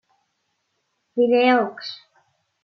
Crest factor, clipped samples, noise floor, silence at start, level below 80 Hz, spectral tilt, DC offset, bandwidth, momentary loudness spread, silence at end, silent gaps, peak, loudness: 18 dB; under 0.1%; -73 dBFS; 1.15 s; -82 dBFS; -5.5 dB/octave; under 0.1%; 6.2 kHz; 18 LU; 0.7 s; none; -6 dBFS; -19 LUFS